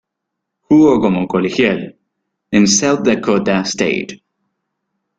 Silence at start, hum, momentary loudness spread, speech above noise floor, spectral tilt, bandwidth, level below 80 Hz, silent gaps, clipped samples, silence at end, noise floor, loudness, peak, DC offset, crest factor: 0.7 s; none; 10 LU; 64 dB; -4.5 dB/octave; 9.4 kHz; -50 dBFS; none; under 0.1%; 1 s; -77 dBFS; -14 LUFS; 0 dBFS; under 0.1%; 16 dB